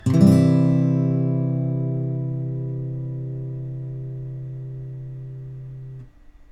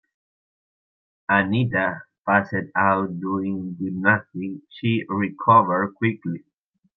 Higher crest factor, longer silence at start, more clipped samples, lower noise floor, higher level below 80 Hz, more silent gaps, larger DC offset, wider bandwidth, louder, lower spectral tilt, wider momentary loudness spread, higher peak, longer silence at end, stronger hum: about the same, 20 dB vs 20 dB; second, 0 s vs 1.3 s; neither; second, -45 dBFS vs under -90 dBFS; first, -50 dBFS vs -66 dBFS; neither; neither; first, 11 kHz vs 5.8 kHz; about the same, -22 LUFS vs -22 LUFS; about the same, -9.5 dB/octave vs -9.5 dB/octave; first, 20 LU vs 15 LU; about the same, -2 dBFS vs -4 dBFS; second, 0.15 s vs 0.6 s; neither